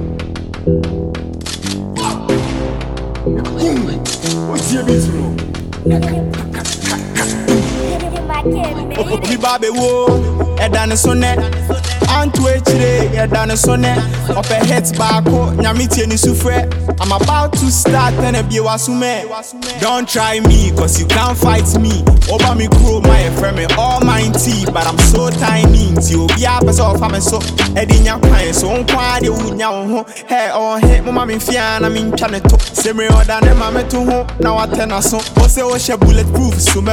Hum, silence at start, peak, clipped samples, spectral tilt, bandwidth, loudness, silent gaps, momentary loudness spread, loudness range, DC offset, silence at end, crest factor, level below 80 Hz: none; 0 s; 0 dBFS; under 0.1%; -5 dB/octave; 17.5 kHz; -13 LUFS; none; 8 LU; 5 LU; under 0.1%; 0 s; 12 dB; -18 dBFS